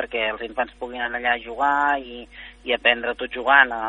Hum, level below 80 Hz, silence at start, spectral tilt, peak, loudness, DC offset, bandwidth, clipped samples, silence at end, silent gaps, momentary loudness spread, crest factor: none; -52 dBFS; 0 s; -4 dB/octave; 0 dBFS; -22 LUFS; under 0.1%; 9.6 kHz; under 0.1%; 0 s; none; 15 LU; 22 dB